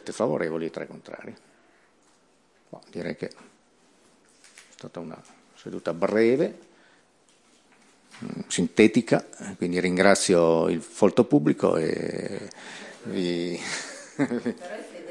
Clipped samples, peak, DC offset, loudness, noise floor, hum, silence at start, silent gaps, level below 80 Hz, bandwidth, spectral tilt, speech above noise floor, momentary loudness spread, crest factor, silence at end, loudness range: under 0.1%; -4 dBFS; under 0.1%; -24 LUFS; -63 dBFS; none; 0.05 s; none; -70 dBFS; 12 kHz; -5 dB/octave; 38 dB; 21 LU; 24 dB; 0 s; 19 LU